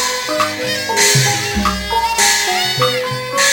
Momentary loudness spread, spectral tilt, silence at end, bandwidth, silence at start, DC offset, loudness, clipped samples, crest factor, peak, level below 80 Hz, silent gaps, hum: 6 LU; -2 dB/octave; 0 s; 17 kHz; 0 s; under 0.1%; -14 LUFS; under 0.1%; 16 dB; 0 dBFS; -36 dBFS; none; none